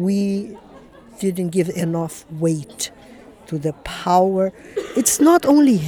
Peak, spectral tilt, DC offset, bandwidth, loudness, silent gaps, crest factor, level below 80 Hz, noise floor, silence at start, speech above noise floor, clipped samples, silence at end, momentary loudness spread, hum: -4 dBFS; -5.5 dB/octave; under 0.1%; 20 kHz; -19 LUFS; none; 16 dB; -52 dBFS; -44 dBFS; 0 s; 25 dB; under 0.1%; 0 s; 15 LU; none